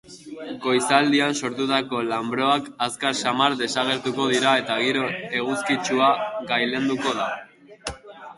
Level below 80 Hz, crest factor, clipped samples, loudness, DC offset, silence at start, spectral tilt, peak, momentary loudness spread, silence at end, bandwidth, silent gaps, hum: -58 dBFS; 20 dB; under 0.1%; -22 LUFS; under 0.1%; 0.1 s; -3.5 dB/octave; -2 dBFS; 16 LU; 0.05 s; 11.5 kHz; none; none